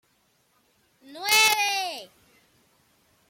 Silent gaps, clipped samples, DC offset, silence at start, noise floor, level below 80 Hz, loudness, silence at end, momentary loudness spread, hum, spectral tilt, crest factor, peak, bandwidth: none; under 0.1%; under 0.1%; 1.1 s; -67 dBFS; -72 dBFS; -21 LUFS; 1.25 s; 15 LU; none; 2 dB/octave; 26 dB; -2 dBFS; 16.5 kHz